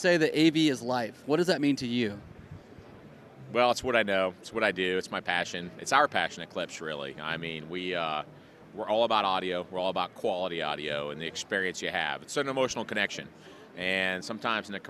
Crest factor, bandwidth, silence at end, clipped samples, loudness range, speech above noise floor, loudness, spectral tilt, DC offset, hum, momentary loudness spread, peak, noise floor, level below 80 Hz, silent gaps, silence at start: 22 dB; 13.5 kHz; 0 s; under 0.1%; 3 LU; 21 dB; -29 LUFS; -4 dB/octave; under 0.1%; none; 11 LU; -6 dBFS; -50 dBFS; -66 dBFS; none; 0 s